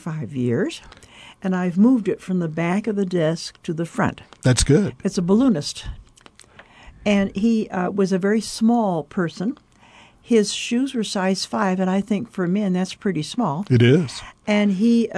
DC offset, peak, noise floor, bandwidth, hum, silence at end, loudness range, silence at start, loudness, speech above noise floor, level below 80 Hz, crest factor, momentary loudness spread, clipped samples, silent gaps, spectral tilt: under 0.1%; -6 dBFS; -50 dBFS; 11 kHz; none; 0 s; 2 LU; 0.05 s; -21 LUFS; 30 dB; -44 dBFS; 16 dB; 11 LU; under 0.1%; none; -6 dB/octave